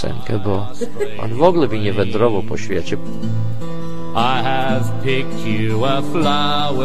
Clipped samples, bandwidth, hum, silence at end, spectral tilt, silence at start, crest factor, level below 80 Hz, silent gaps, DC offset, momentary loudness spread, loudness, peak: under 0.1%; 13.5 kHz; none; 0 s; -6.5 dB/octave; 0 s; 18 dB; -44 dBFS; none; 10%; 9 LU; -19 LUFS; 0 dBFS